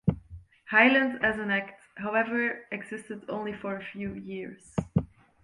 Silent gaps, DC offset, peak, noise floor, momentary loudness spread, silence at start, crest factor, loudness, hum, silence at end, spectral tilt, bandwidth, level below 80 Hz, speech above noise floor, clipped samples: none; under 0.1%; -6 dBFS; -49 dBFS; 18 LU; 0.05 s; 24 dB; -28 LUFS; none; 0.4 s; -6.5 dB/octave; 11 kHz; -52 dBFS; 21 dB; under 0.1%